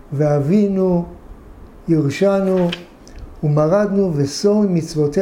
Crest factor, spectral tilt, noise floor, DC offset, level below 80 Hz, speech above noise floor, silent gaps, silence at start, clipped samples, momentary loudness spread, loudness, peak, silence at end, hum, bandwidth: 12 dB; -7.5 dB/octave; -39 dBFS; under 0.1%; -42 dBFS; 23 dB; none; 0.1 s; under 0.1%; 7 LU; -17 LUFS; -4 dBFS; 0 s; none; 15 kHz